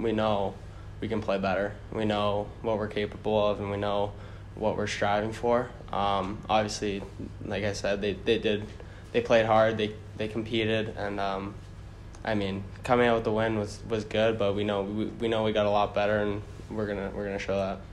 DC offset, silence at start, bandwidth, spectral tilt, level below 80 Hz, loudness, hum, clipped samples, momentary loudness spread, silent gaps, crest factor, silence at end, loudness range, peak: under 0.1%; 0 s; 12 kHz; -5.5 dB/octave; -48 dBFS; -29 LUFS; 50 Hz at -45 dBFS; under 0.1%; 12 LU; none; 20 dB; 0 s; 2 LU; -10 dBFS